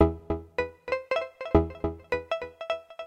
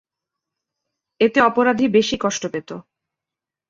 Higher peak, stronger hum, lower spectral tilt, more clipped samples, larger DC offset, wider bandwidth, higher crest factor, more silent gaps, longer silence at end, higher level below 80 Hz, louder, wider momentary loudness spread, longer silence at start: second, -8 dBFS vs -2 dBFS; neither; first, -8 dB/octave vs -4 dB/octave; neither; neither; first, 8.4 kHz vs 7.6 kHz; about the same, 22 dB vs 20 dB; neither; second, 0 s vs 0.9 s; first, -40 dBFS vs -58 dBFS; second, -30 LUFS vs -18 LUFS; second, 9 LU vs 16 LU; second, 0 s vs 1.2 s